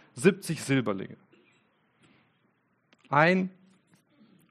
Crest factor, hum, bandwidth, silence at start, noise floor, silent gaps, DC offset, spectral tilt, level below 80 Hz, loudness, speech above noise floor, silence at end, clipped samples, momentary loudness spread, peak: 24 dB; none; 13 kHz; 0.15 s; -71 dBFS; none; under 0.1%; -5.5 dB/octave; -74 dBFS; -27 LUFS; 45 dB; 1 s; under 0.1%; 14 LU; -6 dBFS